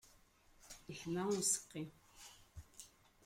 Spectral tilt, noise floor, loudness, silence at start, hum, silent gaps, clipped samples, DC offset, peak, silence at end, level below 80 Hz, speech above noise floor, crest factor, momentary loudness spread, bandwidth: -3.5 dB/octave; -69 dBFS; -40 LUFS; 0.05 s; none; none; under 0.1%; under 0.1%; -22 dBFS; 0.4 s; -70 dBFS; 28 dB; 22 dB; 23 LU; 16.5 kHz